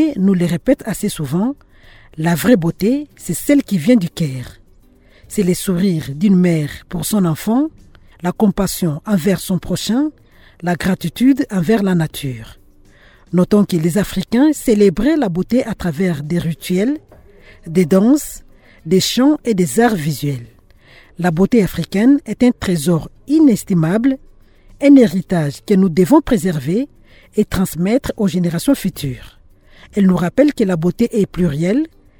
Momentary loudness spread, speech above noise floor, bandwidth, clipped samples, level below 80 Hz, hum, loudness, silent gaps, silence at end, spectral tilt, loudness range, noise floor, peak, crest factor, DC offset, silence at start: 10 LU; 33 dB; 19.5 kHz; under 0.1%; -40 dBFS; none; -16 LUFS; none; 0.3 s; -6.5 dB/octave; 4 LU; -48 dBFS; 0 dBFS; 16 dB; under 0.1%; 0 s